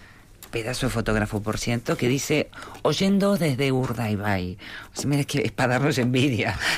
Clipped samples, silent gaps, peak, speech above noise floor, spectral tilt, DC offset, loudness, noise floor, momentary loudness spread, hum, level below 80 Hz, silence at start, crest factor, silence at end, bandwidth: under 0.1%; none; -12 dBFS; 23 dB; -5 dB/octave; under 0.1%; -24 LUFS; -47 dBFS; 9 LU; none; -44 dBFS; 0 s; 12 dB; 0 s; 16 kHz